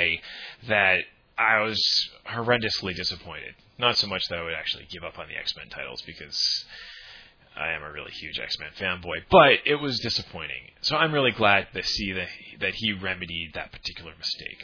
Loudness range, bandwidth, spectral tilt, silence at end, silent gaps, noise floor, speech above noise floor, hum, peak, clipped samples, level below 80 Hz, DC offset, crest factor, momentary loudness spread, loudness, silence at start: 8 LU; 5.4 kHz; -3.5 dB/octave; 0 s; none; -50 dBFS; 23 dB; none; -2 dBFS; under 0.1%; -54 dBFS; under 0.1%; 24 dB; 16 LU; -25 LUFS; 0 s